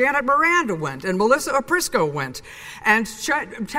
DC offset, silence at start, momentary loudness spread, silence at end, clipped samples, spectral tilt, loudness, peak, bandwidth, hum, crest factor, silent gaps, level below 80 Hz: under 0.1%; 0 s; 10 LU; 0 s; under 0.1%; -3.5 dB/octave; -20 LUFS; -2 dBFS; 16 kHz; none; 18 dB; none; -52 dBFS